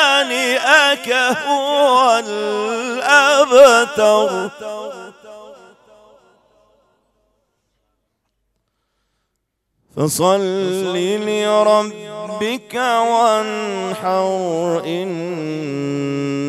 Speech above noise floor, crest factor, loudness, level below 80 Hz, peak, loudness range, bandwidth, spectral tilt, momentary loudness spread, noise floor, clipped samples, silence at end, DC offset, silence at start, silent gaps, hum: 57 dB; 18 dB; -15 LUFS; -66 dBFS; 0 dBFS; 10 LU; 15.5 kHz; -3.5 dB/octave; 13 LU; -73 dBFS; under 0.1%; 0 s; under 0.1%; 0 s; none; none